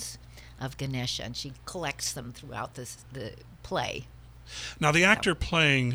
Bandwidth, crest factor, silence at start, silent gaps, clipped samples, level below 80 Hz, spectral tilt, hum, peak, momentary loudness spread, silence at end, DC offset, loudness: over 20 kHz; 24 dB; 0 s; none; under 0.1%; -48 dBFS; -4 dB/octave; none; -6 dBFS; 19 LU; 0 s; under 0.1%; -28 LUFS